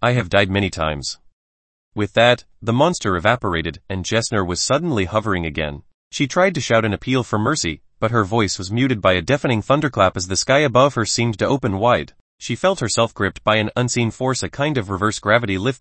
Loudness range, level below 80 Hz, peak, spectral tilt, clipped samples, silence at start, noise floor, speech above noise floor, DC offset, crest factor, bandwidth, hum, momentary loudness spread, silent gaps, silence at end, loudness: 3 LU; -44 dBFS; 0 dBFS; -4.5 dB/octave; under 0.1%; 0 s; under -90 dBFS; over 71 dB; under 0.1%; 18 dB; 8.8 kHz; none; 9 LU; 1.33-1.91 s, 5.94-6.11 s, 12.20-12.38 s; 0.05 s; -19 LUFS